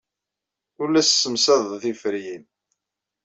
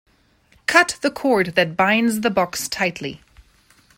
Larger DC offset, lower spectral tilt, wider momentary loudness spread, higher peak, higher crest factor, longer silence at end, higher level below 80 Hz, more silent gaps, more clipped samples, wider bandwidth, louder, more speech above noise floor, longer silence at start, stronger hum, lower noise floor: neither; second, -2 dB/octave vs -3.5 dB/octave; first, 15 LU vs 9 LU; second, -6 dBFS vs 0 dBFS; about the same, 18 dB vs 20 dB; about the same, 0.85 s vs 0.8 s; second, -70 dBFS vs -56 dBFS; neither; neither; second, 8.2 kHz vs 16.5 kHz; about the same, -20 LUFS vs -19 LUFS; first, 64 dB vs 38 dB; about the same, 0.8 s vs 0.7 s; neither; first, -85 dBFS vs -57 dBFS